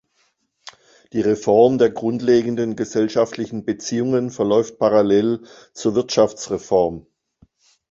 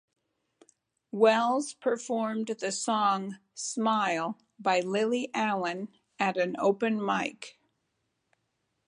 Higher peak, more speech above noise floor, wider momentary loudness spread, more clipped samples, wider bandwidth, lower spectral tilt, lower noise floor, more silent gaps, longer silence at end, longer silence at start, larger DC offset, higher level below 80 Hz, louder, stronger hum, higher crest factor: first, -2 dBFS vs -10 dBFS; about the same, 47 dB vs 50 dB; about the same, 10 LU vs 11 LU; neither; second, 7.8 kHz vs 11 kHz; first, -5.5 dB/octave vs -4 dB/octave; second, -66 dBFS vs -79 dBFS; neither; second, 0.9 s vs 1.35 s; about the same, 1.15 s vs 1.15 s; neither; first, -56 dBFS vs -82 dBFS; first, -19 LUFS vs -29 LUFS; neither; about the same, 18 dB vs 20 dB